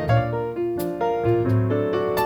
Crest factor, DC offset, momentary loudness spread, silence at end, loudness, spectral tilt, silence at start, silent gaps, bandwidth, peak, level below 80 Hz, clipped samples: 14 dB; under 0.1%; 5 LU; 0 s; -23 LUFS; -8 dB/octave; 0 s; none; over 20 kHz; -8 dBFS; -44 dBFS; under 0.1%